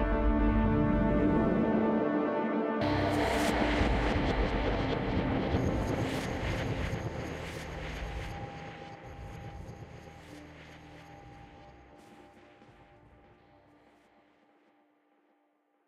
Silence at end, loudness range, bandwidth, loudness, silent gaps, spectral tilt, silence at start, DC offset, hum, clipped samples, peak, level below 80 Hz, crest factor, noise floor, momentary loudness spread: 3.25 s; 22 LU; 15 kHz; -31 LUFS; none; -6.5 dB/octave; 0 s; under 0.1%; none; under 0.1%; -16 dBFS; -40 dBFS; 16 dB; -73 dBFS; 22 LU